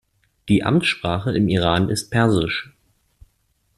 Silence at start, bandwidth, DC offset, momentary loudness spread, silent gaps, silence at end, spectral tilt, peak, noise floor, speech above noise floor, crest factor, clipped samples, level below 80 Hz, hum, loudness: 0.45 s; 12.5 kHz; under 0.1%; 6 LU; none; 1.15 s; -5.5 dB/octave; -2 dBFS; -66 dBFS; 47 dB; 18 dB; under 0.1%; -46 dBFS; none; -20 LUFS